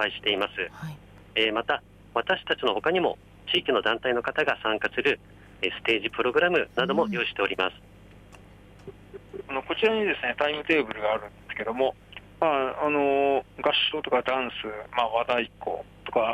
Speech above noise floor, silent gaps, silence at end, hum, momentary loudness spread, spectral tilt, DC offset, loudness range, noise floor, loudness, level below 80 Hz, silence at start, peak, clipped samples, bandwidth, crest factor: 24 dB; none; 0 s; 50 Hz at -55 dBFS; 11 LU; -5 dB/octave; under 0.1%; 3 LU; -50 dBFS; -26 LUFS; -56 dBFS; 0 s; -10 dBFS; under 0.1%; 12.5 kHz; 18 dB